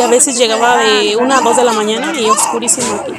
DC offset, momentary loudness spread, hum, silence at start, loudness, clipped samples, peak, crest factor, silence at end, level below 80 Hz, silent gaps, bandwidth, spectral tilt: under 0.1%; 4 LU; none; 0 s; -11 LUFS; 0.2%; 0 dBFS; 12 dB; 0 s; -56 dBFS; none; over 20 kHz; -1.5 dB/octave